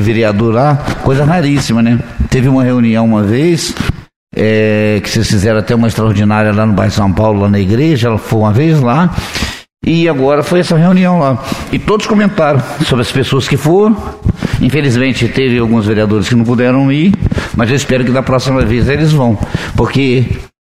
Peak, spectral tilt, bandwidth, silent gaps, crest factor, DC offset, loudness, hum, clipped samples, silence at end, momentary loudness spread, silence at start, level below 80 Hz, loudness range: 0 dBFS; -6.5 dB/octave; 15.5 kHz; 4.16-4.27 s; 10 dB; 1%; -11 LUFS; none; under 0.1%; 0.15 s; 6 LU; 0 s; -28 dBFS; 1 LU